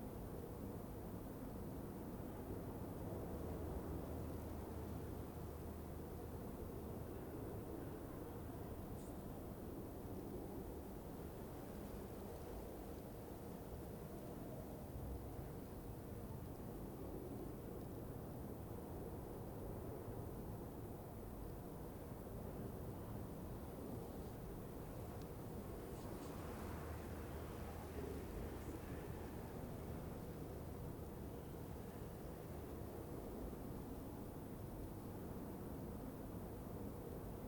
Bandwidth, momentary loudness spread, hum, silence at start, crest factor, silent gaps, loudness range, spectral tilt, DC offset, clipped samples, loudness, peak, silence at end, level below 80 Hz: 19.5 kHz; 3 LU; none; 0 s; 14 dB; none; 2 LU; -7 dB/octave; under 0.1%; under 0.1%; -51 LUFS; -36 dBFS; 0 s; -58 dBFS